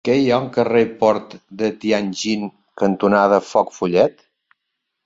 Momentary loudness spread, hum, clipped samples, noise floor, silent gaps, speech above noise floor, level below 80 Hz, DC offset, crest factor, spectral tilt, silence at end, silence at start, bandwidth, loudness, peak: 8 LU; none; under 0.1%; -77 dBFS; none; 59 dB; -58 dBFS; under 0.1%; 16 dB; -5.5 dB/octave; 0.95 s; 0.05 s; 7.8 kHz; -18 LUFS; -2 dBFS